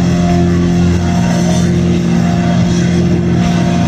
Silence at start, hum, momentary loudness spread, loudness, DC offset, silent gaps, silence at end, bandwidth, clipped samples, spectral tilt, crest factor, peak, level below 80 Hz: 0 s; none; 1 LU; -12 LUFS; under 0.1%; none; 0 s; 9.8 kHz; under 0.1%; -7 dB/octave; 10 dB; -2 dBFS; -24 dBFS